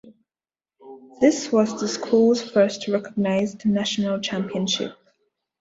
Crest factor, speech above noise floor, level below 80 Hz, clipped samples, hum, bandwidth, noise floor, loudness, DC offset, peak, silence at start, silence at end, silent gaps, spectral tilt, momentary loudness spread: 18 dB; over 69 dB; -62 dBFS; under 0.1%; none; 8 kHz; under -90 dBFS; -22 LUFS; under 0.1%; -6 dBFS; 0.05 s; 0.7 s; none; -5 dB/octave; 7 LU